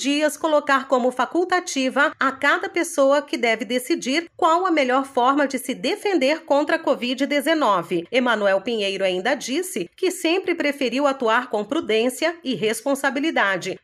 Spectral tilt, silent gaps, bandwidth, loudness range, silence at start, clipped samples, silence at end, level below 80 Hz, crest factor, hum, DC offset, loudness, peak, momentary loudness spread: -3 dB/octave; none; 15.5 kHz; 2 LU; 0 s; under 0.1%; 0.05 s; -72 dBFS; 16 dB; none; under 0.1%; -21 LUFS; -6 dBFS; 5 LU